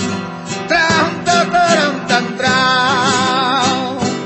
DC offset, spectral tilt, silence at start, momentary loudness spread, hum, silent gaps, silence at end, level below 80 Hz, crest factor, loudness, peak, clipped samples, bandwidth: under 0.1%; -3.5 dB/octave; 0 s; 7 LU; none; none; 0 s; -50 dBFS; 14 dB; -14 LUFS; 0 dBFS; under 0.1%; 10.5 kHz